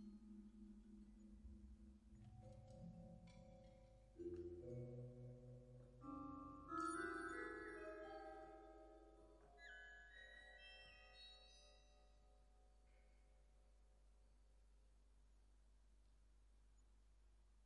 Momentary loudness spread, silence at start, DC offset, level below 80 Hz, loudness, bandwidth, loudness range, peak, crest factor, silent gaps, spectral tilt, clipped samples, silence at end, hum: 17 LU; 0 s; under 0.1%; -70 dBFS; -57 LUFS; 10.5 kHz; 12 LU; -38 dBFS; 22 dB; none; -5.5 dB/octave; under 0.1%; 0 s; none